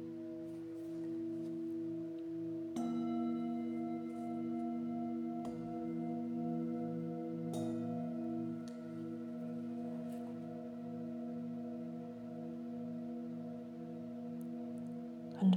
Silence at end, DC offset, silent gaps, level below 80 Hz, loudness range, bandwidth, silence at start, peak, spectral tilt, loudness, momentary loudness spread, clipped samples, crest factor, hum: 0 s; under 0.1%; none; -80 dBFS; 5 LU; 10.5 kHz; 0 s; -22 dBFS; -8.5 dB/octave; -42 LUFS; 7 LU; under 0.1%; 20 dB; none